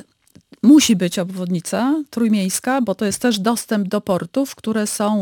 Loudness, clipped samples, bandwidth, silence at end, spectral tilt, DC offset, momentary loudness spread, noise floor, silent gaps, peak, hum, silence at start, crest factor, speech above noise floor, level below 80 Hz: -18 LUFS; under 0.1%; 19 kHz; 0 s; -4.5 dB/octave; under 0.1%; 10 LU; -52 dBFS; none; -2 dBFS; none; 0.65 s; 16 dB; 34 dB; -58 dBFS